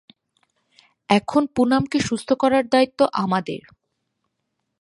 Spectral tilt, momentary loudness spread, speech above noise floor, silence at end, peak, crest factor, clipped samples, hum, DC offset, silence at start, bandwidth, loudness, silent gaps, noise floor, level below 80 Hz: -5.5 dB/octave; 6 LU; 57 dB; 1.25 s; 0 dBFS; 22 dB; under 0.1%; none; under 0.1%; 1.1 s; 11.5 kHz; -20 LUFS; none; -77 dBFS; -56 dBFS